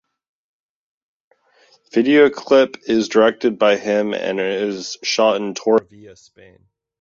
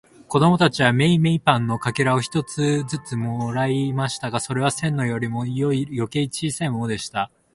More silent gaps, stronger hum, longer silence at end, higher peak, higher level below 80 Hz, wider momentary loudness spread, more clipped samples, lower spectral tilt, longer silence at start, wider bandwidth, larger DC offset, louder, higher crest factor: neither; neither; first, 0.9 s vs 0.3 s; about the same, -2 dBFS vs 0 dBFS; second, -64 dBFS vs -54 dBFS; about the same, 8 LU vs 9 LU; neither; second, -4 dB/octave vs -5.5 dB/octave; first, 1.95 s vs 0.3 s; second, 7.4 kHz vs 11.5 kHz; neither; first, -17 LUFS vs -22 LUFS; about the same, 18 dB vs 20 dB